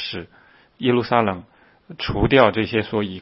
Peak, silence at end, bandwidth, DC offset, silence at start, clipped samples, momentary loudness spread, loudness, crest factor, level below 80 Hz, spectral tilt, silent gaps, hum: 0 dBFS; 0 s; 5.8 kHz; under 0.1%; 0 s; under 0.1%; 14 LU; -20 LUFS; 20 dB; -40 dBFS; -10.5 dB/octave; none; none